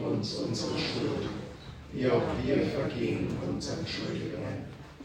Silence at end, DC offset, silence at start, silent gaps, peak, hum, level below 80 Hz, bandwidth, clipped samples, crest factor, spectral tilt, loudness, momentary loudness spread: 0 s; under 0.1%; 0 s; none; -14 dBFS; none; -52 dBFS; 16 kHz; under 0.1%; 18 dB; -6 dB/octave; -32 LUFS; 12 LU